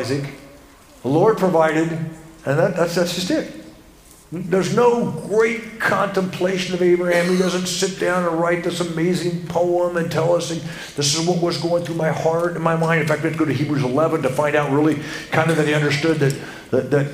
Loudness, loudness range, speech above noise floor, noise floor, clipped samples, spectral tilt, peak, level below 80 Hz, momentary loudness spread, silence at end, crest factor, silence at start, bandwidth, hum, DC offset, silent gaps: -19 LUFS; 2 LU; 27 dB; -46 dBFS; under 0.1%; -5 dB/octave; 0 dBFS; -54 dBFS; 7 LU; 0 s; 18 dB; 0 s; 16 kHz; none; under 0.1%; none